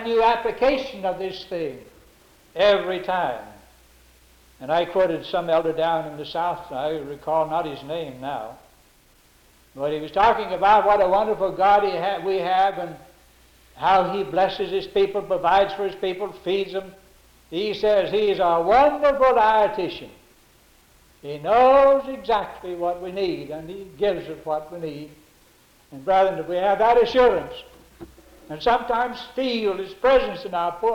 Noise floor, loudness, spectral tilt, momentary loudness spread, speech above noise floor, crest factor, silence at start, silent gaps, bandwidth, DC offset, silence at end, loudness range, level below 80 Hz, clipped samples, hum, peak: -56 dBFS; -22 LUFS; -5.5 dB/octave; 15 LU; 35 dB; 16 dB; 0 s; none; 18 kHz; under 0.1%; 0 s; 7 LU; -50 dBFS; under 0.1%; none; -6 dBFS